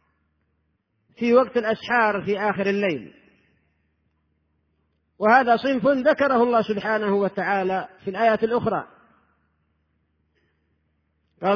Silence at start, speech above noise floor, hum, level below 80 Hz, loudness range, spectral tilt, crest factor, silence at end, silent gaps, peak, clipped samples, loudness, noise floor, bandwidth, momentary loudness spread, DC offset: 1.2 s; 50 dB; none; -64 dBFS; 7 LU; -7 dB/octave; 20 dB; 0 s; none; -4 dBFS; under 0.1%; -21 LUFS; -71 dBFS; 5.4 kHz; 9 LU; under 0.1%